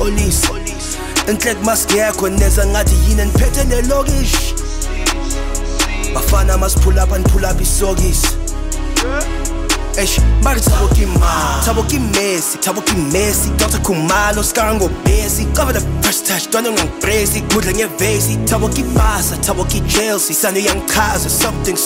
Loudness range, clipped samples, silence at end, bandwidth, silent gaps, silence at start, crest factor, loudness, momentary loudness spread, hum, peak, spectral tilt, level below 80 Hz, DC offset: 2 LU; under 0.1%; 0 s; 16.5 kHz; none; 0 s; 12 dB; -15 LUFS; 5 LU; none; -2 dBFS; -4 dB/octave; -18 dBFS; under 0.1%